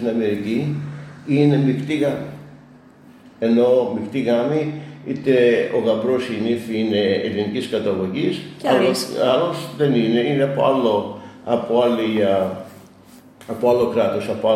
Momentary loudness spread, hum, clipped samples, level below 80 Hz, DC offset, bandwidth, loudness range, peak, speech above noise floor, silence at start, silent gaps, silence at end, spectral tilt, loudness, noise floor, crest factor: 11 LU; none; under 0.1%; -60 dBFS; under 0.1%; 15 kHz; 2 LU; -4 dBFS; 28 dB; 0 s; none; 0 s; -6.5 dB/octave; -19 LUFS; -46 dBFS; 16 dB